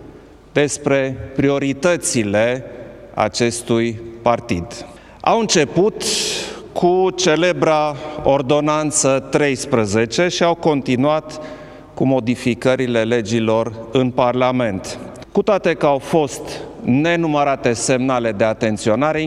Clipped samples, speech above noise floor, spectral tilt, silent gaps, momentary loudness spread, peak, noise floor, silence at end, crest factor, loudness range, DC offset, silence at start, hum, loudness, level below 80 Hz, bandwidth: under 0.1%; 24 dB; -4.5 dB/octave; none; 9 LU; 0 dBFS; -41 dBFS; 0 s; 18 dB; 2 LU; under 0.1%; 0 s; none; -17 LUFS; -46 dBFS; 14.5 kHz